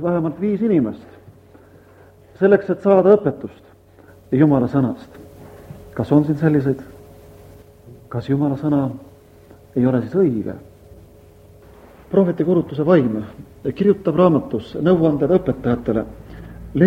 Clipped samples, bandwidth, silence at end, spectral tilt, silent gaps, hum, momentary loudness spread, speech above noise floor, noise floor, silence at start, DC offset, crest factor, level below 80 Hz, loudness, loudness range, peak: under 0.1%; 15 kHz; 0 s; -10 dB/octave; none; none; 18 LU; 30 dB; -47 dBFS; 0 s; under 0.1%; 20 dB; -48 dBFS; -18 LUFS; 5 LU; 0 dBFS